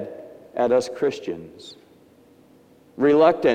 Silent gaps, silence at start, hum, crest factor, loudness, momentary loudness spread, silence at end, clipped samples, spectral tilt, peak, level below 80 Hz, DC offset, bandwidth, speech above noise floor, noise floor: none; 0 s; none; 20 dB; -21 LUFS; 25 LU; 0 s; under 0.1%; -5.5 dB/octave; -4 dBFS; -66 dBFS; under 0.1%; 10 kHz; 33 dB; -53 dBFS